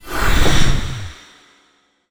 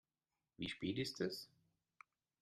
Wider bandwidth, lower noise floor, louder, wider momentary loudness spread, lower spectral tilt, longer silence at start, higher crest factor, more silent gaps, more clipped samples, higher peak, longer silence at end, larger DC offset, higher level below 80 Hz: first, over 20 kHz vs 13.5 kHz; second, -59 dBFS vs under -90 dBFS; first, -19 LUFS vs -44 LUFS; first, 18 LU vs 9 LU; about the same, -4 dB/octave vs -5 dB/octave; second, 0.05 s vs 0.6 s; second, 14 dB vs 20 dB; neither; neither; first, -2 dBFS vs -28 dBFS; about the same, 0.95 s vs 0.95 s; neither; first, -22 dBFS vs -76 dBFS